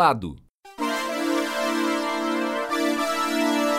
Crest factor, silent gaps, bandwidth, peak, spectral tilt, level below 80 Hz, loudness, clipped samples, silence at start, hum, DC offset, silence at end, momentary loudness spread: 20 dB; 0.50-0.58 s; 16 kHz; -4 dBFS; -3.5 dB/octave; -56 dBFS; -24 LUFS; under 0.1%; 0 s; none; under 0.1%; 0 s; 5 LU